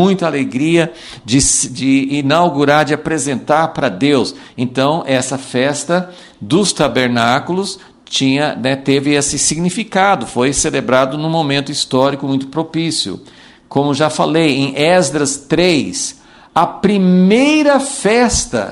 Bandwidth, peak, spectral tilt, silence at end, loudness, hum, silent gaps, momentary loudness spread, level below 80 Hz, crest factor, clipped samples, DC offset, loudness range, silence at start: 12 kHz; 0 dBFS; -4 dB/octave; 0 s; -14 LUFS; none; none; 8 LU; -40 dBFS; 14 dB; under 0.1%; under 0.1%; 3 LU; 0 s